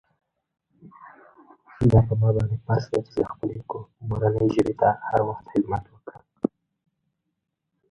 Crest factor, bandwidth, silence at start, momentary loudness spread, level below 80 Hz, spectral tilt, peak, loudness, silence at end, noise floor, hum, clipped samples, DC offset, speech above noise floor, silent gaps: 22 dB; 8 kHz; 0.85 s; 16 LU; -44 dBFS; -9.5 dB/octave; -4 dBFS; -24 LUFS; 1.45 s; -80 dBFS; none; under 0.1%; under 0.1%; 57 dB; none